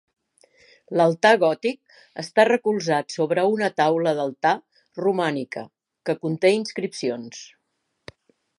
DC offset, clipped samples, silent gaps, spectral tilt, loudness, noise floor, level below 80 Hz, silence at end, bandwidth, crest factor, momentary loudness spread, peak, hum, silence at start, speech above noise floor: under 0.1%; under 0.1%; none; -5 dB/octave; -22 LUFS; -75 dBFS; -72 dBFS; 1.15 s; 11.5 kHz; 20 dB; 16 LU; -2 dBFS; none; 0.9 s; 53 dB